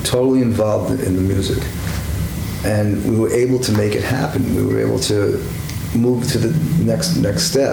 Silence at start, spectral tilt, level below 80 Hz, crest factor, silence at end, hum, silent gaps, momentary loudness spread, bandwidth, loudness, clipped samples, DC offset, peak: 0 s; -5.5 dB/octave; -32 dBFS; 14 dB; 0 s; none; none; 7 LU; over 20 kHz; -18 LUFS; under 0.1%; under 0.1%; -4 dBFS